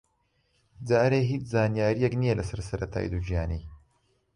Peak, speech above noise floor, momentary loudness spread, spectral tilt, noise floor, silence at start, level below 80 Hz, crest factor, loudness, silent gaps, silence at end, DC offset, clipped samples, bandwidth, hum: -12 dBFS; 45 dB; 10 LU; -7.5 dB/octave; -72 dBFS; 0.8 s; -42 dBFS; 16 dB; -27 LUFS; none; 0.6 s; under 0.1%; under 0.1%; 11 kHz; none